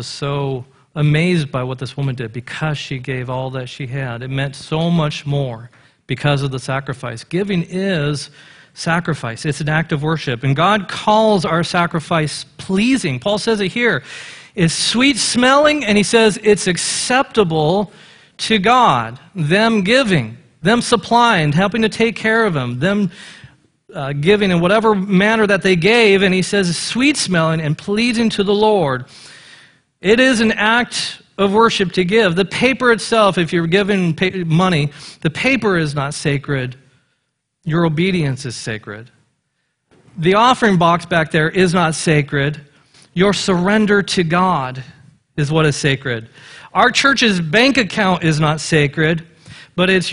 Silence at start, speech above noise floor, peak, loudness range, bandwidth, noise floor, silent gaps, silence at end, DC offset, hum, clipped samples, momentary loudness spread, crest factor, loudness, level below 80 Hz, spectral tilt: 0 s; 55 dB; 0 dBFS; 7 LU; 11 kHz; -70 dBFS; none; 0 s; under 0.1%; none; under 0.1%; 12 LU; 16 dB; -16 LUFS; -46 dBFS; -5 dB/octave